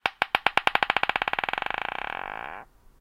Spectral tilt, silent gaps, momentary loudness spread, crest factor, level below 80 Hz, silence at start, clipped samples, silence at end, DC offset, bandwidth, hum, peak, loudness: -2.5 dB/octave; none; 13 LU; 28 dB; -56 dBFS; 0.05 s; under 0.1%; 0.35 s; under 0.1%; 16.5 kHz; none; 0 dBFS; -26 LUFS